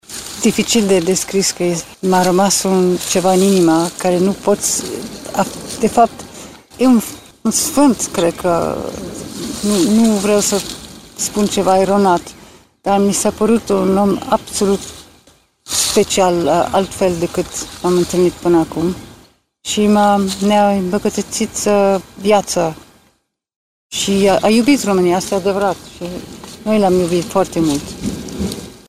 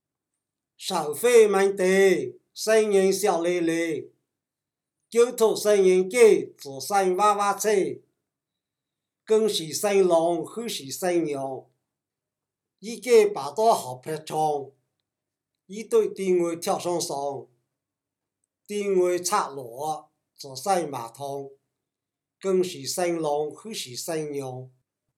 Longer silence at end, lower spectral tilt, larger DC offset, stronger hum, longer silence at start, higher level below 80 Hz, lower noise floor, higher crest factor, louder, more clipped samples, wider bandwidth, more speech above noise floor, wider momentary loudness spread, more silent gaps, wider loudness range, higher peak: second, 0.15 s vs 0.5 s; about the same, -4.5 dB/octave vs -4 dB/octave; first, 0.2% vs under 0.1%; neither; second, 0.1 s vs 0.8 s; first, -44 dBFS vs -84 dBFS; second, -60 dBFS vs -88 dBFS; about the same, 16 dB vs 20 dB; first, -15 LUFS vs -24 LUFS; neither; about the same, 16 kHz vs 17 kHz; second, 46 dB vs 64 dB; second, 13 LU vs 16 LU; first, 23.56-23.90 s vs none; second, 3 LU vs 8 LU; first, 0 dBFS vs -6 dBFS